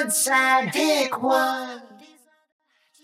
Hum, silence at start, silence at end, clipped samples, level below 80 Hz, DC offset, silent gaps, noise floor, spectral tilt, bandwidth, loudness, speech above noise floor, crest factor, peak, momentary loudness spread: none; 0 s; 1.1 s; under 0.1%; -86 dBFS; under 0.1%; none; -54 dBFS; -2 dB/octave; 17 kHz; -20 LUFS; 33 dB; 16 dB; -8 dBFS; 14 LU